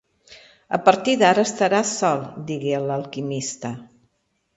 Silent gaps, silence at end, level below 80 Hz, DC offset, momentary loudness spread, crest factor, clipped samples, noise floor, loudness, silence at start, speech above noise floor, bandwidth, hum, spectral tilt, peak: none; 0.7 s; -64 dBFS; under 0.1%; 13 LU; 22 dB; under 0.1%; -70 dBFS; -21 LUFS; 0.3 s; 50 dB; 8.2 kHz; none; -4 dB/octave; 0 dBFS